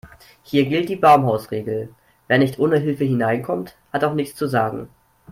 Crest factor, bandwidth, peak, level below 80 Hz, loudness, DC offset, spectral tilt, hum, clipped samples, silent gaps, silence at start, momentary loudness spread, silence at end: 18 dB; 16 kHz; -2 dBFS; -58 dBFS; -20 LUFS; under 0.1%; -7 dB/octave; none; under 0.1%; none; 0.05 s; 13 LU; 0 s